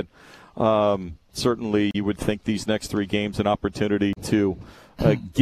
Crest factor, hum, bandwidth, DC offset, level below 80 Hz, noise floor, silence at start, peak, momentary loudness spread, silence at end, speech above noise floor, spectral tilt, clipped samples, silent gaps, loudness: 18 dB; none; 14 kHz; under 0.1%; -46 dBFS; -49 dBFS; 0 s; -4 dBFS; 5 LU; 0 s; 26 dB; -6 dB/octave; under 0.1%; none; -24 LUFS